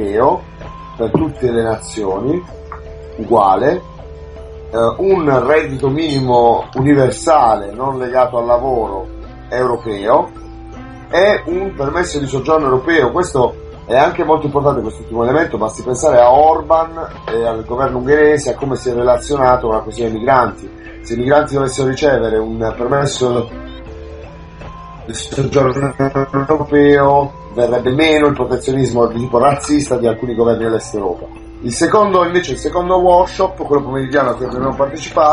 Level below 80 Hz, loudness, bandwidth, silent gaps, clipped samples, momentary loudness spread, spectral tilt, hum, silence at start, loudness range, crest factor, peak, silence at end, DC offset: -36 dBFS; -14 LUFS; 11 kHz; none; under 0.1%; 20 LU; -6 dB/octave; none; 0 s; 4 LU; 14 dB; 0 dBFS; 0 s; under 0.1%